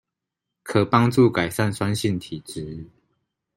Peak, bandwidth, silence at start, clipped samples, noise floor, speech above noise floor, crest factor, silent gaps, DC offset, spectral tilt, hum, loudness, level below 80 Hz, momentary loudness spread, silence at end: -2 dBFS; 16 kHz; 0.65 s; under 0.1%; -84 dBFS; 63 dB; 22 dB; none; under 0.1%; -6 dB/octave; none; -21 LUFS; -56 dBFS; 17 LU; 0.7 s